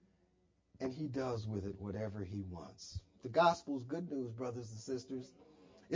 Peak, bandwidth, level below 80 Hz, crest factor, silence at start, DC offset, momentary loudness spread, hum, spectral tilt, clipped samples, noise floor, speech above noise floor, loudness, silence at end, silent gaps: -18 dBFS; 7.6 kHz; -62 dBFS; 22 dB; 0.75 s; under 0.1%; 17 LU; none; -6.5 dB/octave; under 0.1%; -75 dBFS; 36 dB; -40 LUFS; 0 s; none